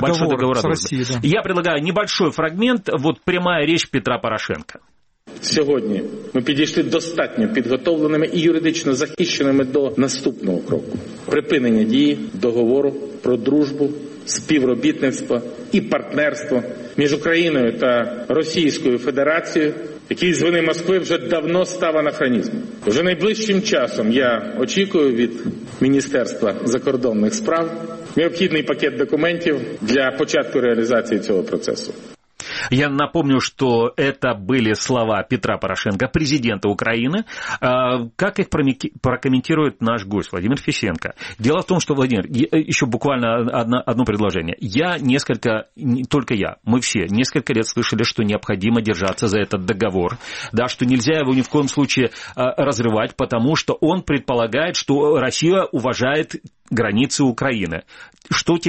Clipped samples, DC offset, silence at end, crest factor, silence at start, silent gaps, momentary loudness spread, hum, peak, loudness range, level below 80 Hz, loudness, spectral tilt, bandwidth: under 0.1%; under 0.1%; 0 s; 16 dB; 0 s; none; 6 LU; none; -4 dBFS; 2 LU; -50 dBFS; -19 LUFS; -5 dB/octave; 8.8 kHz